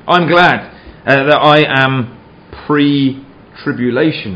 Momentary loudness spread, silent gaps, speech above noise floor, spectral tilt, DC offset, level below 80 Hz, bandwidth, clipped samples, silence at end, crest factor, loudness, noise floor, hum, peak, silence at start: 15 LU; none; 24 dB; -7 dB/octave; under 0.1%; -46 dBFS; 8 kHz; 0.3%; 0 s; 12 dB; -11 LUFS; -35 dBFS; none; 0 dBFS; 0.05 s